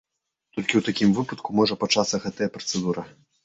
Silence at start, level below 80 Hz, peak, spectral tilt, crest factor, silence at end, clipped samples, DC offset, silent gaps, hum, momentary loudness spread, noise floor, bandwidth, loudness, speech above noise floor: 0.55 s; -60 dBFS; -4 dBFS; -4.5 dB/octave; 22 dB; 0.35 s; under 0.1%; under 0.1%; none; none; 8 LU; -70 dBFS; 8 kHz; -24 LUFS; 46 dB